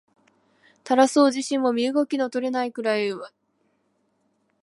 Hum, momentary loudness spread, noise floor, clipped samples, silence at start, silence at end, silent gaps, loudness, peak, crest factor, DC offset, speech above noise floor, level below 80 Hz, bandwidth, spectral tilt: none; 9 LU; -70 dBFS; under 0.1%; 0.85 s; 1.35 s; none; -22 LUFS; -2 dBFS; 22 dB; under 0.1%; 48 dB; -80 dBFS; 11.5 kHz; -3.5 dB/octave